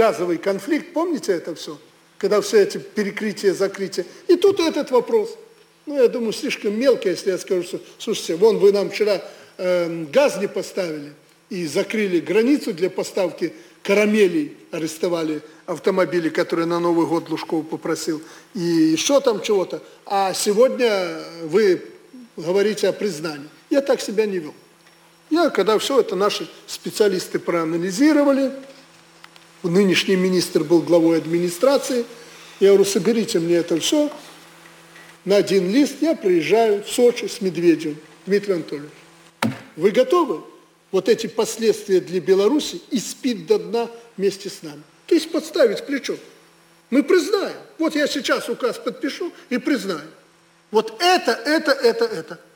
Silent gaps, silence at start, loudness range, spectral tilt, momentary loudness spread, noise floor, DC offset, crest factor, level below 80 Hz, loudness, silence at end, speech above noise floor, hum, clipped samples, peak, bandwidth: none; 0 s; 4 LU; -4.5 dB/octave; 13 LU; -55 dBFS; under 0.1%; 16 dB; -70 dBFS; -20 LUFS; 0.2 s; 35 dB; none; under 0.1%; -4 dBFS; 19.5 kHz